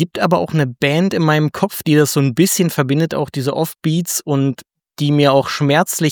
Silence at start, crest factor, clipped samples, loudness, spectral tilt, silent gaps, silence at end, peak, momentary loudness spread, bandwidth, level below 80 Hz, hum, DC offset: 0 s; 14 dB; under 0.1%; -16 LUFS; -5 dB/octave; none; 0 s; 0 dBFS; 6 LU; over 20 kHz; -58 dBFS; none; under 0.1%